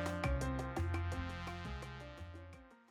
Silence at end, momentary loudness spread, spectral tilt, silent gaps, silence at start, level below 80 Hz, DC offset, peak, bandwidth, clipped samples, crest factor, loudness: 0.1 s; 15 LU; -6 dB/octave; none; 0 s; -48 dBFS; under 0.1%; -24 dBFS; 14 kHz; under 0.1%; 16 dB; -42 LUFS